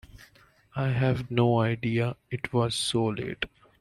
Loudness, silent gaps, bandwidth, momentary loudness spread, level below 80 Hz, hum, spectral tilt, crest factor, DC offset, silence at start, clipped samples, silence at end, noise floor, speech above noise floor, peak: -28 LUFS; none; 12 kHz; 11 LU; -56 dBFS; none; -5.5 dB/octave; 18 dB; under 0.1%; 0.15 s; under 0.1%; 0.35 s; -59 dBFS; 33 dB; -10 dBFS